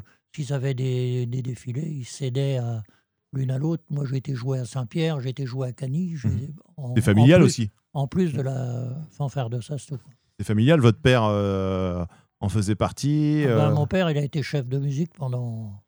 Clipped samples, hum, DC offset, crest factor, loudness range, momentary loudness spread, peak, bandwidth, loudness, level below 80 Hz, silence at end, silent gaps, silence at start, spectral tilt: under 0.1%; none; under 0.1%; 20 dB; 6 LU; 14 LU; -4 dBFS; over 20 kHz; -24 LUFS; -52 dBFS; 0.1 s; none; 0.35 s; -7 dB/octave